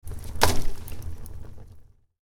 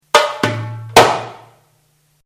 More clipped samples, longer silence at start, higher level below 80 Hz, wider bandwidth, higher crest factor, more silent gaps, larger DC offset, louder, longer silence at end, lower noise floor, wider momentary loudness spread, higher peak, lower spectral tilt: second, under 0.1% vs 0.8%; about the same, 0.05 s vs 0.15 s; first, -34 dBFS vs -48 dBFS; second, 18 kHz vs over 20 kHz; first, 24 dB vs 16 dB; neither; neither; second, -29 LUFS vs -14 LUFS; second, 0.1 s vs 0.9 s; second, -49 dBFS vs -59 dBFS; first, 21 LU vs 15 LU; about the same, -2 dBFS vs 0 dBFS; about the same, -3.5 dB/octave vs -3 dB/octave